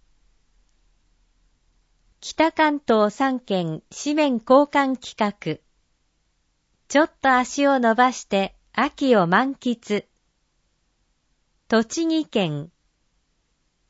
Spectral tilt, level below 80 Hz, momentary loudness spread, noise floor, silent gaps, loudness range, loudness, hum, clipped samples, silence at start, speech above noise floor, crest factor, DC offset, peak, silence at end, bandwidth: -5 dB/octave; -62 dBFS; 12 LU; -69 dBFS; none; 6 LU; -21 LUFS; none; under 0.1%; 2.2 s; 49 dB; 20 dB; under 0.1%; -4 dBFS; 1.25 s; 8 kHz